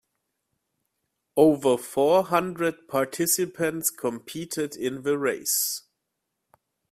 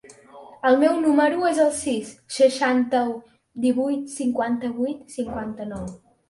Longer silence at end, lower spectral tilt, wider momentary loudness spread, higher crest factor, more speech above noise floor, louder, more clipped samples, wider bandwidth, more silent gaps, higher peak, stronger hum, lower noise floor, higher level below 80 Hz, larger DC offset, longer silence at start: first, 1.1 s vs 0.35 s; about the same, -3.5 dB/octave vs -4.5 dB/octave; second, 10 LU vs 14 LU; about the same, 20 dB vs 18 dB; first, 56 dB vs 24 dB; second, -25 LUFS vs -22 LUFS; neither; first, 16 kHz vs 11.5 kHz; neither; about the same, -6 dBFS vs -6 dBFS; neither; first, -81 dBFS vs -46 dBFS; second, -68 dBFS vs -56 dBFS; neither; first, 1.35 s vs 0.1 s